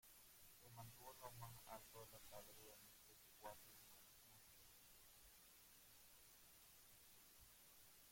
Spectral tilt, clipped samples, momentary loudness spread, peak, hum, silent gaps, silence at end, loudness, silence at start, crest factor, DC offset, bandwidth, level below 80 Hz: -2.5 dB/octave; under 0.1%; 7 LU; -40 dBFS; none; none; 0 s; -63 LUFS; 0 s; 24 dB; under 0.1%; 16.5 kHz; -80 dBFS